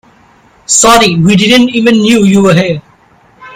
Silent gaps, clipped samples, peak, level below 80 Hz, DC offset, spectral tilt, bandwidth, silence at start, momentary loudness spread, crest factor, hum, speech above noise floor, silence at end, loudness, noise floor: none; 1%; 0 dBFS; -40 dBFS; under 0.1%; -4 dB/octave; over 20 kHz; 0.7 s; 5 LU; 8 dB; none; 38 dB; 0 s; -6 LUFS; -44 dBFS